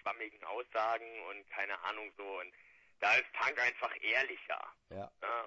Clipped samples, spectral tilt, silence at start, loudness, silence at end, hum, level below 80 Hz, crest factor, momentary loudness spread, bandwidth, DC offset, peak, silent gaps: under 0.1%; -2.5 dB/octave; 0.05 s; -36 LUFS; 0 s; none; -80 dBFS; 20 dB; 16 LU; 8 kHz; under 0.1%; -18 dBFS; none